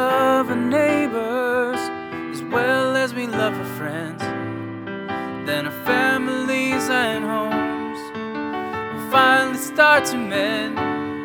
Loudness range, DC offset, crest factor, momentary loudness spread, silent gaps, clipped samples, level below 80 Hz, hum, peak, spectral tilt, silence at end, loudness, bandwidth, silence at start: 5 LU; under 0.1%; 20 dB; 12 LU; none; under 0.1%; -62 dBFS; none; 0 dBFS; -4 dB/octave; 0 s; -21 LUFS; over 20 kHz; 0 s